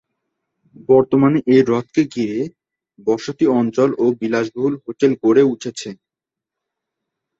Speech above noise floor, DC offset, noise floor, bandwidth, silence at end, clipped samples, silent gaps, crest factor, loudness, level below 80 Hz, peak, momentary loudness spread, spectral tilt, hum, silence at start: 70 dB; under 0.1%; -86 dBFS; 8 kHz; 1.45 s; under 0.1%; none; 16 dB; -17 LUFS; -60 dBFS; -2 dBFS; 12 LU; -7 dB/octave; none; 0.9 s